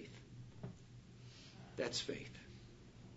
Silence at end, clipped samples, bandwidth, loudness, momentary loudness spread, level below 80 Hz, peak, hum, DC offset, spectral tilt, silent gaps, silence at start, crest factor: 0 s; under 0.1%; 7.6 kHz; -48 LUFS; 18 LU; -68 dBFS; -26 dBFS; none; under 0.1%; -3.5 dB/octave; none; 0 s; 24 dB